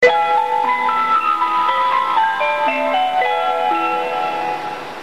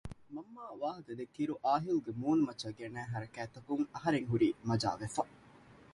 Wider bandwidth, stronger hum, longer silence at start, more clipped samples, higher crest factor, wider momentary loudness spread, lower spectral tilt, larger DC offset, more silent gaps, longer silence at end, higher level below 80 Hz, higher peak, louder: first, 14 kHz vs 11.5 kHz; neither; about the same, 0 s vs 0.05 s; neither; about the same, 16 dB vs 18 dB; second, 5 LU vs 14 LU; second, -3 dB/octave vs -6.5 dB/octave; first, 0.7% vs under 0.1%; neither; second, 0 s vs 0.2 s; about the same, -64 dBFS vs -64 dBFS; first, -2 dBFS vs -18 dBFS; first, -17 LUFS vs -36 LUFS